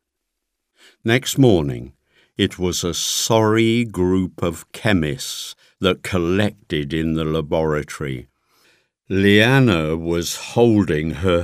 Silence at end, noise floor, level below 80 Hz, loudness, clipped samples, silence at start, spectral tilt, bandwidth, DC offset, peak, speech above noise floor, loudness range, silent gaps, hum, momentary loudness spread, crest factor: 0 s; -79 dBFS; -42 dBFS; -19 LUFS; under 0.1%; 1.05 s; -5 dB/octave; 15.5 kHz; under 0.1%; 0 dBFS; 60 dB; 4 LU; none; none; 12 LU; 18 dB